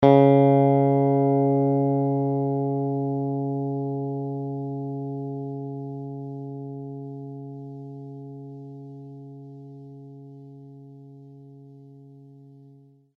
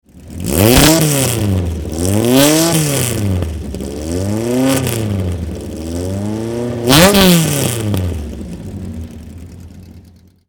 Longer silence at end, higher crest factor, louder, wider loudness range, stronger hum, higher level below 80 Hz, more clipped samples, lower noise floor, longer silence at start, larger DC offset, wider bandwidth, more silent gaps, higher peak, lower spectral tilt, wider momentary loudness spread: first, 0.95 s vs 0.5 s; first, 22 dB vs 14 dB; second, -24 LUFS vs -13 LUFS; first, 22 LU vs 6 LU; neither; second, -66 dBFS vs -30 dBFS; second, under 0.1% vs 0.2%; first, -53 dBFS vs -43 dBFS; second, 0 s vs 0.15 s; neither; second, 3.9 kHz vs over 20 kHz; neither; second, -4 dBFS vs 0 dBFS; first, -11.5 dB/octave vs -4.5 dB/octave; first, 25 LU vs 19 LU